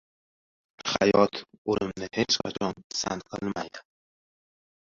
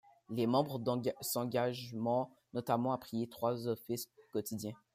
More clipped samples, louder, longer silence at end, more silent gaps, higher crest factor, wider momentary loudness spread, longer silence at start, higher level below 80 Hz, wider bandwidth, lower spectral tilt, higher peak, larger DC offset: neither; first, -28 LUFS vs -37 LUFS; first, 1.15 s vs 0.2 s; first, 1.58-1.65 s, 2.84-2.90 s vs none; first, 24 dB vs 18 dB; first, 13 LU vs 9 LU; first, 0.8 s vs 0.3 s; first, -60 dBFS vs -76 dBFS; second, 7.6 kHz vs 15.5 kHz; second, -4 dB/octave vs -5.5 dB/octave; first, -6 dBFS vs -18 dBFS; neither